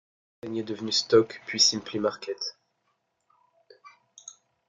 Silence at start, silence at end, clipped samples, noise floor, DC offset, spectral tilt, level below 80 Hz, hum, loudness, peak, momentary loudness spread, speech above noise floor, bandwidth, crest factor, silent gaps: 0.45 s; 0.35 s; under 0.1%; -75 dBFS; under 0.1%; -2.5 dB/octave; -72 dBFS; none; -25 LUFS; -8 dBFS; 25 LU; 49 dB; 11 kHz; 22 dB; none